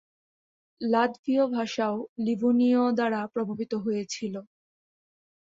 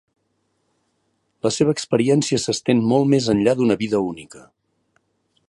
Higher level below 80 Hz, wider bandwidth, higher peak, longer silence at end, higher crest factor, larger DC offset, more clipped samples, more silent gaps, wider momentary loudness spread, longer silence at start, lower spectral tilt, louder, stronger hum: second, -72 dBFS vs -58 dBFS; second, 7.8 kHz vs 11.5 kHz; second, -10 dBFS vs -4 dBFS; about the same, 1.15 s vs 1.1 s; about the same, 16 dB vs 18 dB; neither; neither; first, 1.19-1.24 s, 2.09-2.16 s vs none; first, 11 LU vs 7 LU; second, 0.8 s vs 1.45 s; about the same, -5.5 dB/octave vs -5.5 dB/octave; second, -27 LUFS vs -19 LUFS; neither